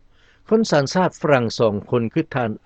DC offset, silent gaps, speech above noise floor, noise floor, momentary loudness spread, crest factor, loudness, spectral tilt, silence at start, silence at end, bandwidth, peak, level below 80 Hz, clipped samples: under 0.1%; none; 31 dB; -50 dBFS; 5 LU; 20 dB; -20 LUFS; -6 dB/octave; 0.5 s; 0.1 s; 8.6 kHz; 0 dBFS; -54 dBFS; under 0.1%